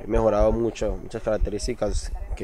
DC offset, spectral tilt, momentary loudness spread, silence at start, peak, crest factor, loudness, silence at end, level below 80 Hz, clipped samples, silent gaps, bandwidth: under 0.1%; -6 dB/octave; 10 LU; 0 s; -8 dBFS; 16 dB; -25 LUFS; 0 s; -30 dBFS; under 0.1%; none; 11.5 kHz